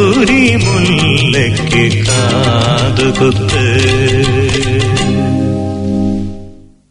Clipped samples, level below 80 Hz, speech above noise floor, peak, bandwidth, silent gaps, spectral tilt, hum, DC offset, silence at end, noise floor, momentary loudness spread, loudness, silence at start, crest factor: under 0.1%; -30 dBFS; 23 dB; 0 dBFS; 11 kHz; none; -5 dB/octave; none; under 0.1%; 0.35 s; -33 dBFS; 7 LU; -11 LUFS; 0 s; 10 dB